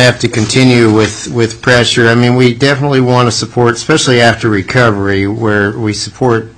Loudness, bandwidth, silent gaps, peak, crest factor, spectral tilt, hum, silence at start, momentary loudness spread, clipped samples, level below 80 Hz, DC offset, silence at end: -10 LUFS; 11 kHz; none; 0 dBFS; 10 dB; -5 dB/octave; none; 0 s; 6 LU; 0.3%; -40 dBFS; 0.4%; 0.05 s